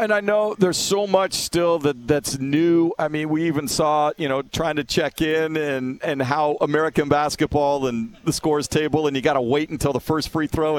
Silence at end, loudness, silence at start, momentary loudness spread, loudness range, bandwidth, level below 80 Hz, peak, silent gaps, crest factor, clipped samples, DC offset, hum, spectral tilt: 0 s; -21 LUFS; 0 s; 5 LU; 2 LU; 17 kHz; -46 dBFS; -2 dBFS; none; 20 dB; under 0.1%; under 0.1%; none; -4.5 dB/octave